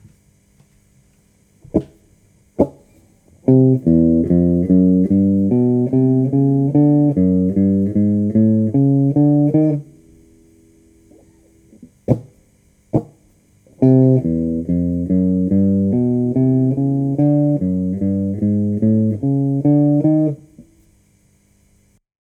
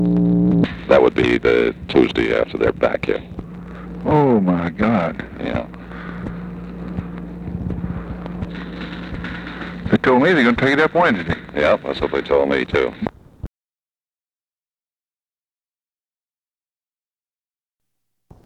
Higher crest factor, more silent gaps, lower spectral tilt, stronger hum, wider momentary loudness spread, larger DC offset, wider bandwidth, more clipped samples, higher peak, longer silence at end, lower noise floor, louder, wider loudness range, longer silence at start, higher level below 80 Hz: about the same, 16 dB vs 20 dB; neither; first, -12.5 dB/octave vs -7.5 dB/octave; neither; second, 8 LU vs 17 LU; neither; second, 2.5 kHz vs 8.6 kHz; neither; about the same, 0 dBFS vs 0 dBFS; second, 1.6 s vs 5 s; second, -56 dBFS vs under -90 dBFS; about the same, -16 LUFS vs -18 LUFS; second, 9 LU vs 12 LU; first, 1.75 s vs 0 s; about the same, -44 dBFS vs -40 dBFS